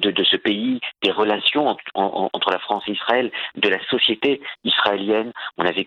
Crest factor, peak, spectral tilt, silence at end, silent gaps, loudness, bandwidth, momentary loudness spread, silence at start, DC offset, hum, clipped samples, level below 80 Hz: 20 dB; 0 dBFS; -5.5 dB/octave; 0 s; none; -20 LUFS; 7.2 kHz; 6 LU; 0 s; under 0.1%; none; under 0.1%; -68 dBFS